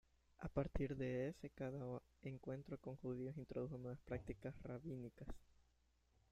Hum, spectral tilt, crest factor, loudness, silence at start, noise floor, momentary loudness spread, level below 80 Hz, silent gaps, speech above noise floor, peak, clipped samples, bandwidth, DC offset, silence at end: none; -8.5 dB/octave; 20 dB; -50 LUFS; 0.4 s; -79 dBFS; 10 LU; -60 dBFS; none; 31 dB; -28 dBFS; under 0.1%; 9.2 kHz; under 0.1%; 0.7 s